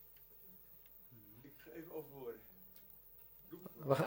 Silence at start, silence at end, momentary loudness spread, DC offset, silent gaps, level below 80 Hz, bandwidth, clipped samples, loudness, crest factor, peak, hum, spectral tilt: 0 s; 0 s; 9 LU; under 0.1%; none; -76 dBFS; 17 kHz; under 0.1%; -51 LUFS; 28 dB; -18 dBFS; none; -7 dB/octave